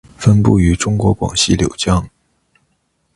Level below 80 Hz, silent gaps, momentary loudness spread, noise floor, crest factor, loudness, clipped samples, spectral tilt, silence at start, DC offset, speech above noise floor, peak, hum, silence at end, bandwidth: -28 dBFS; none; 6 LU; -64 dBFS; 16 dB; -14 LUFS; under 0.1%; -5.5 dB/octave; 0.2 s; under 0.1%; 51 dB; 0 dBFS; none; 1.1 s; 11.5 kHz